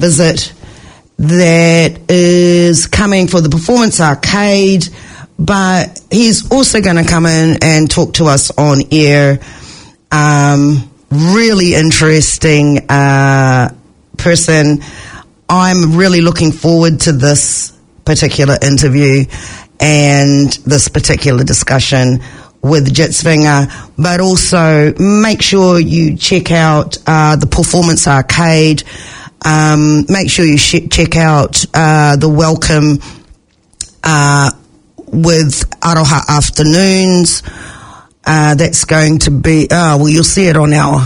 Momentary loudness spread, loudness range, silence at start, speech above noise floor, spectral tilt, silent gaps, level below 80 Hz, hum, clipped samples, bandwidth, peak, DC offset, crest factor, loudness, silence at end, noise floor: 8 LU; 2 LU; 0 s; 35 dB; -4.5 dB/octave; none; -30 dBFS; none; 0.5%; 11 kHz; 0 dBFS; under 0.1%; 8 dB; -9 LUFS; 0 s; -44 dBFS